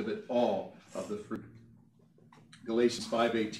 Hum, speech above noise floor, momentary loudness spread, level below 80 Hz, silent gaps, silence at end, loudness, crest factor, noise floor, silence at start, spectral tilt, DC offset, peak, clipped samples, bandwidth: none; 30 dB; 14 LU; -72 dBFS; none; 0 s; -33 LUFS; 20 dB; -62 dBFS; 0 s; -5 dB/octave; under 0.1%; -14 dBFS; under 0.1%; 13 kHz